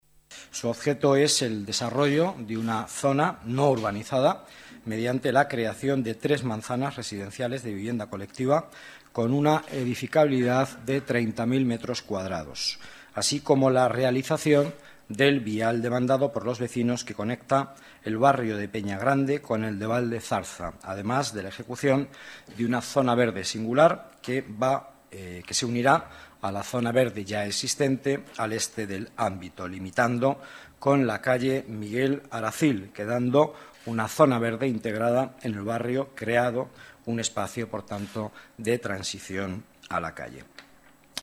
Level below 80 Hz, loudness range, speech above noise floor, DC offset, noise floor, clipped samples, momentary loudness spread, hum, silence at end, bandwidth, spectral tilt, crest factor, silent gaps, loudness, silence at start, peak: -62 dBFS; 4 LU; 30 dB; under 0.1%; -56 dBFS; under 0.1%; 13 LU; none; 0 s; 14.5 kHz; -5 dB/octave; 20 dB; none; -26 LUFS; 0.3 s; -6 dBFS